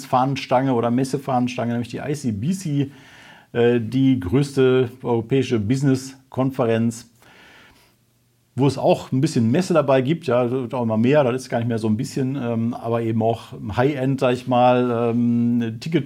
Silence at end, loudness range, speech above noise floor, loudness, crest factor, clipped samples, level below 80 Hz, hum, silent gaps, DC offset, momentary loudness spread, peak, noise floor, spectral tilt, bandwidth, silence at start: 0 s; 4 LU; 42 dB; -21 LUFS; 16 dB; under 0.1%; -58 dBFS; none; none; under 0.1%; 7 LU; -4 dBFS; -62 dBFS; -7 dB/octave; 14.5 kHz; 0 s